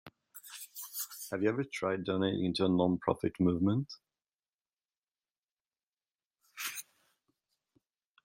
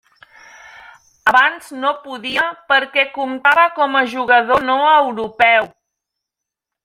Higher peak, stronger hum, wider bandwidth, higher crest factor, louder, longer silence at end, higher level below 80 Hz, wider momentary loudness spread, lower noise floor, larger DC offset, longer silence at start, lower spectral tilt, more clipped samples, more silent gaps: second, -14 dBFS vs -2 dBFS; neither; about the same, 16.5 kHz vs 16 kHz; first, 22 dB vs 16 dB; second, -33 LUFS vs -15 LUFS; first, 1.4 s vs 1.2 s; second, -70 dBFS vs -56 dBFS; first, 18 LU vs 8 LU; first, under -90 dBFS vs -83 dBFS; neither; second, 0.05 s vs 1.25 s; first, -5.5 dB/octave vs -3 dB/octave; neither; first, 4.34-4.39 s, 4.55-4.65 s, 4.85-4.89 s, 4.98-5.02 s, 5.31-5.35 s, 5.51-5.57 s, 6.15-6.19 s, 6.26-6.31 s vs none